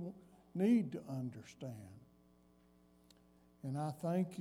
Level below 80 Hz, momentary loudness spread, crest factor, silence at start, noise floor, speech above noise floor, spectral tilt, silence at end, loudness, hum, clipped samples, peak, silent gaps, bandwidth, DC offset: -78 dBFS; 19 LU; 18 dB; 0 s; -68 dBFS; 30 dB; -8 dB/octave; 0 s; -40 LUFS; none; under 0.1%; -22 dBFS; none; 14.5 kHz; under 0.1%